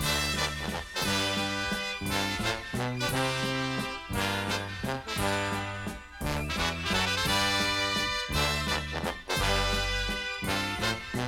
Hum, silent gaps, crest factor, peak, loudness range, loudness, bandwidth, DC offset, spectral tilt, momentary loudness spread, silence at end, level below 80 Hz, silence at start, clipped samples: none; none; 18 dB; -12 dBFS; 3 LU; -29 LUFS; 19 kHz; under 0.1%; -3.5 dB/octave; 7 LU; 0 s; -42 dBFS; 0 s; under 0.1%